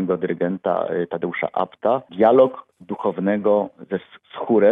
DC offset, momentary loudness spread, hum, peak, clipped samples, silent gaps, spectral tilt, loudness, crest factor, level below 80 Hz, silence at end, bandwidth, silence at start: under 0.1%; 13 LU; none; -2 dBFS; under 0.1%; none; -10 dB/octave; -21 LUFS; 18 dB; -66 dBFS; 0 s; 3.8 kHz; 0 s